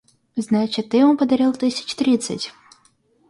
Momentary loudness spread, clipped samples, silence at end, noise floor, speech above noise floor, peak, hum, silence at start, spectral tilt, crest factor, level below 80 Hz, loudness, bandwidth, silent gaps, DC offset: 13 LU; under 0.1%; 0.8 s; -59 dBFS; 41 dB; -6 dBFS; none; 0.35 s; -5 dB/octave; 14 dB; -62 dBFS; -19 LUFS; 11.5 kHz; none; under 0.1%